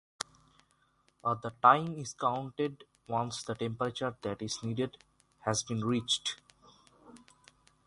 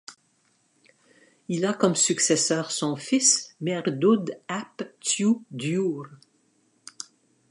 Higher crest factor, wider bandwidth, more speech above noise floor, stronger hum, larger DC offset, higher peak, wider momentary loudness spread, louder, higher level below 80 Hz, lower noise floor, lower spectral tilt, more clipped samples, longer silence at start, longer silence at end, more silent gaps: first, 26 dB vs 20 dB; about the same, 11.5 kHz vs 11.5 kHz; about the same, 39 dB vs 42 dB; neither; neither; about the same, -8 dBFS vs -6 dBFS; second, 13 LU vs 19 LU; second, -33 LUFS vs -24 LUFS; first, -68 dBFS vs -78 dBFS; first, -71 dBFS vs -67 dBFS; about the same, -4 dB/octave vs -3.5 dB/octave; neither; first, 1.25 s vs 0.1 s; first, 0.7 s vs 0.5 s; neither